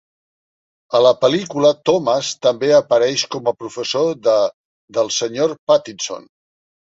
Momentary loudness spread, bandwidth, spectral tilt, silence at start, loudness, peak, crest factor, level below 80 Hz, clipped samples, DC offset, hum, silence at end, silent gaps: 11 LU; 8 kHz; -3.5 dB/octave; 0.9 s; -17 LUFS; -2 dBFS; 16 dB; -64 dBFS; under 0.1%; under 0.1%; none; 0.65 s; 4.54-4.88 s, 5.59-5.67 s